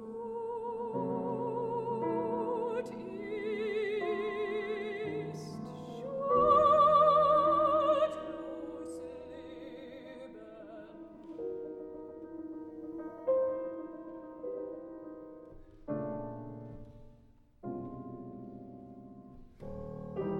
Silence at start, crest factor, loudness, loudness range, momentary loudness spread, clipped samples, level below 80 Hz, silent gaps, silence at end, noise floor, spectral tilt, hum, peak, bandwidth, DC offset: 0 s; 18 dB; -32 LUFS; 18 LU; 23 LU; under 0.1%; -62 dBFS; none; 0 s; -61 dBFS; -7 dB/octave; none; -16 dBFS; 9.8 kHz; under 0.1%